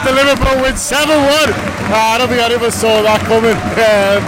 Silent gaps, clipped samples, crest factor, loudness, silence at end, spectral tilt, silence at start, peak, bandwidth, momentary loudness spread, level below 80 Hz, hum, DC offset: none; under 0.1%; 10 dB; -11 LUFS; 0 s; -3.5 dB/octave; 0 s; -2 dBFS; 16.5 kHz; 3 LU; -30 dBFS; none; under 0.1%